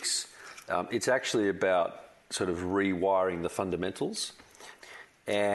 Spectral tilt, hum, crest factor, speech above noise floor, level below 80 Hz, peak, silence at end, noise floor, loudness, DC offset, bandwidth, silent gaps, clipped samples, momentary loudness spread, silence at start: -3.5 dB/octave; none; 16 dB; 22 dB; -64 dBFS; -14 dBFS; 0 s; -51 dBFS; -30 LUFS; under 0.1%; 12 kHz; none; under 0.1%; 21 LU; 0 s